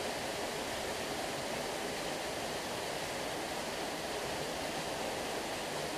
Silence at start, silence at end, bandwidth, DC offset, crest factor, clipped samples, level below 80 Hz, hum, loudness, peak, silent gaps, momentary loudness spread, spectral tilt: 0 s; 0 s; 15.5 kHz; under 0.1%; 12 dB; under 0.1%; -60 dBFS; none; -37 LUFS; -26 dBFS; none; 1 LU; -2.5 dB/octave